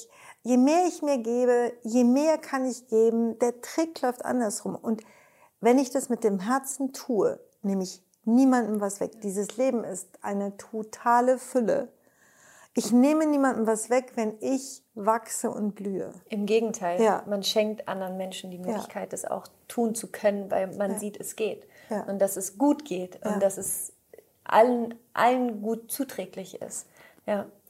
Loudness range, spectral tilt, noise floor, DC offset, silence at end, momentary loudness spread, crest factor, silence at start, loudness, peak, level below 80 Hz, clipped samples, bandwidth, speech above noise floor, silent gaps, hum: 4 LU; -4.5 dB/octave; -60 dBFS; under 0.1%; 0.2 s; 13 LU; 20 dB; 0 s; -27 LUFS; -8 dBFS; -78 dBFS; under 0.1%; 16 kHz; 34 dB; none; none